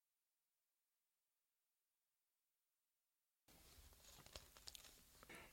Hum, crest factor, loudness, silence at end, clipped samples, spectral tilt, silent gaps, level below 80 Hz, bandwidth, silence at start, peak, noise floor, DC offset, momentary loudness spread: none; 34 dB; -62 LUFS; 0 s; under 0.1%; -2 dB/octave; none; -78 dBFS; 16.5 kHz; 3.5 s; -34 dBFS; under -90 dBFS; under 0.1%; 8 LU